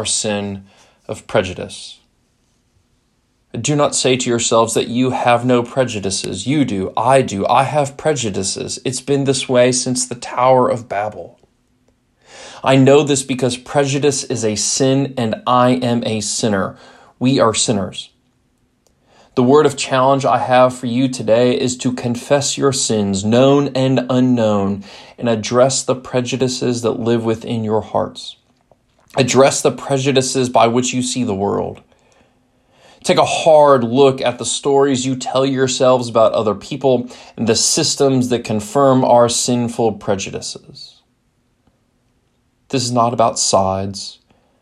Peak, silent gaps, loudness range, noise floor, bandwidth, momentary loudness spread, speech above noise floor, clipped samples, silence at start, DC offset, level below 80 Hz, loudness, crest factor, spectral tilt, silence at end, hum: 0 dBFS; none; 5 LU; -62 dBFS; 13 kHz; 11 LU; 46 dB; under 0.1%; 0 s; under 0.1%; -58 dBFS; -15 LUFS; 16 dB; -4.5 dB/octave; 0.5 s; none